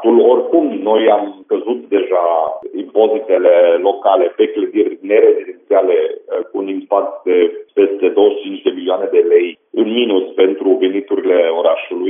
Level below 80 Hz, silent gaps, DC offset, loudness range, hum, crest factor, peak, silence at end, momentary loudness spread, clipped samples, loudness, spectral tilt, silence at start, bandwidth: -76 dBFS; none; under 0.1%; 2 LU; none; 14 dB; 0 dBFS; 0 s; 9 LU; under 0.1%; -14 LUFS; -2.5 dB/octave; 0 s; 3.7 kHz